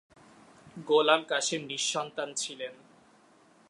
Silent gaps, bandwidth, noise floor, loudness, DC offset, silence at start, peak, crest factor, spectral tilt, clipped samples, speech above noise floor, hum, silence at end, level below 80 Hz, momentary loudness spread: none; 11.5 kHz; -61 dBFS; -28 LUFS; under 0.1%; 0.65 s; -8 dBFS; 24 dB; -1.5 dB/octave; under 0.1%; 32 dB; none; 0.95 s; -80 dBFS; 18 LU